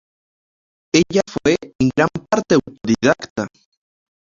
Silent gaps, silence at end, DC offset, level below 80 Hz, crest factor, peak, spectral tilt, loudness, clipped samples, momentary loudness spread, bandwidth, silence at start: 1.75-1.79 s, 3.30-3.36 s; 0.85 s; under 0.1%; -50 dBFS; 18 dB; 0 dBFS; -5 dB/octave; -18 LUFS; under 0.1%; 7 LU; 7.6 kHz; 0.95 s